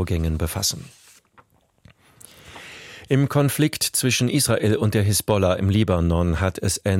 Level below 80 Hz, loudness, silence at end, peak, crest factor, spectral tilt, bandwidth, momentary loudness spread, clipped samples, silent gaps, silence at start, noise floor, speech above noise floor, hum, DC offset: -38 dBFS; -21 LUFS; 0 s; -4 dBFS; 16 dB; -5 dB/octave; 16.5 kHz; 19 LU; under 0.1%; none; 0 s; -57 dBFS; 36 dB; none; under 0.1%